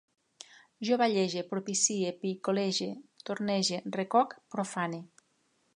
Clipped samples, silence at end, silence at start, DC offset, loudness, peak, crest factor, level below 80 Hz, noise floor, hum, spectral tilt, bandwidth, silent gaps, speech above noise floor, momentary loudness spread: under 0.1%; 0.7 s; 0.8 s; under 0.1%; -31 LUFS; -14 dBFS; 18 dB; -82 dBFS; -73 dBFS; none; -3.5 dB/octave; 11.5 kHz; none; 42 dB; 14 LU